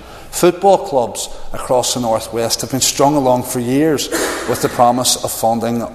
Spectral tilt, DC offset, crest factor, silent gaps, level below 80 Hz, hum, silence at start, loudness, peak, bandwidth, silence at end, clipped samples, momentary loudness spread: -3.5 dB/octave; under 0.1%; 16 dB; none; -38 dBFS; none; 0 s; -15 LUFS; 0 dBFS; 14 kHz; 0 s; under 0.1%; 6 LU